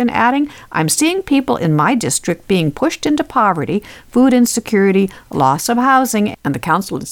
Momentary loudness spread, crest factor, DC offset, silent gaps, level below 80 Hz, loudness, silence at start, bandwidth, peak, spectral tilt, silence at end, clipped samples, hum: 7 LU; 14 dB; under 0.1%; none; -48 dBFS; -15 LUFS; 0 s; 19 kHz; -2 dBFS; -4.5 dB/octave; 0 s; under 0.1%; none